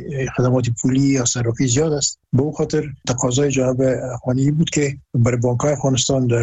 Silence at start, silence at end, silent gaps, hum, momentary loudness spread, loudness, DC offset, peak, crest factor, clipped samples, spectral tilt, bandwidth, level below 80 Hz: 0 s; 0 s; none; none; 5 LU; -19 LUFS; under 0.1%; -6 dBFS; 12 dB; under 0.1%; -5 dB/octave; 8.4 kHz; -44 dBFS